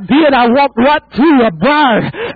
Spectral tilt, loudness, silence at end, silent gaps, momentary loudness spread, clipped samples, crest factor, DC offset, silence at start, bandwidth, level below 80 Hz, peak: -8.5 dB/octave; -10 LUFS; 0 s; none; 3 LU; under 0.1%; 8 dB; under 0.1%; 0 s; 4.9 kHz; -42 dBFS; -2 dBFS